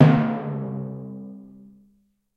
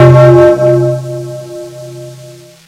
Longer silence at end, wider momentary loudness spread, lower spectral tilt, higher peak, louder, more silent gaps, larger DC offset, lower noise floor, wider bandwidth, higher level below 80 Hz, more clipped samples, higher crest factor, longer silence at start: first, 0.9 s vs 0.35 s; about the same, 23 LU vs 24 LU; first, -10 dB/octave vs -8.5 dB/octave; about the same, 0 dBFS vs 0 dBFS; second, -25 LUFS vs -7 LUFS; neither; neither; first, -64 dBFS vs -33 dBFS; second, 5.2 kHz vs 10.5 kHz; second, -60 dBFS vs -40 dBFS; second, under 0.1% vs 4%; first, 22 dB vs 8 dB; about the same, 0 s vs 0 s